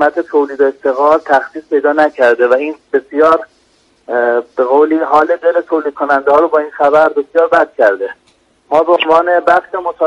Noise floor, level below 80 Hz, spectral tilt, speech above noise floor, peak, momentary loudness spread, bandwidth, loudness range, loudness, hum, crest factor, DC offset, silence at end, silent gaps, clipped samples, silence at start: -53 dBFS; -56 dBFS; -5 dB/octave; 42 dB; 0 dBFS; 6 LU; 9.4 kHz; 2 LU; -12 LUFS; none; 12 dB; under 0.1%; 0 s; none; under 0.1%; 0 s